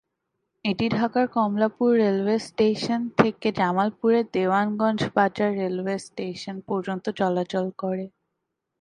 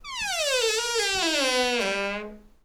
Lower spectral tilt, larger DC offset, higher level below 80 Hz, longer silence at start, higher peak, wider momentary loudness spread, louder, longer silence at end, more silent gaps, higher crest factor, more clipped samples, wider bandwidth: first, -6.5 dB/octave vs -0.5 dB/octave; neither; second, -62 dBFS vs -54 dBFS; first, 0.65 s vs 0.05 s; first, 0 dBFS vs -12 dBFS; about the same, 9 LU vs 8 LU; about the same, -24 LUFS vs -24 LUFS; first, 0.7 s vs 0.15 s; neither; first, 24 dB vs 14 dB; neither; second, 10.5 kHz vs over 20 kHz